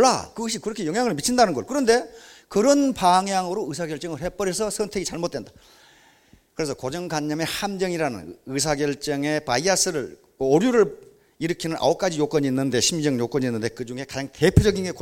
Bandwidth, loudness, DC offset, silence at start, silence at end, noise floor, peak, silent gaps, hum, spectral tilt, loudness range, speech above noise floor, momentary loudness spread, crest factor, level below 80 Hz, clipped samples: 17 kHz; -23 LUFS; under 0.1%; 0 s; 0 s; -56 dBFS; 0 dBFS; none; none; -4.5 dB/octave; 7 LU; 34 dB; 11 LU; 22 dB; -42 dBFS; under 0.1%